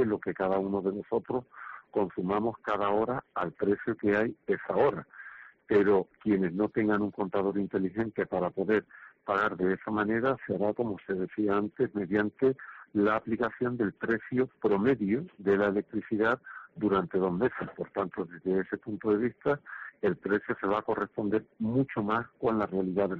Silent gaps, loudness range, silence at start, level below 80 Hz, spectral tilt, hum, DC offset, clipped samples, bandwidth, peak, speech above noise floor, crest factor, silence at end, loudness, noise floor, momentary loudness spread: none; 2 LU; 0 s; -64 dBFS; -6 dB/octave; none; under 0.1%; under 0.1%; 4.9 kHz; -14 dBFS; 20 dB; 16 dB; 0 s; -30 LUFS; -49 dBFS; 7 LU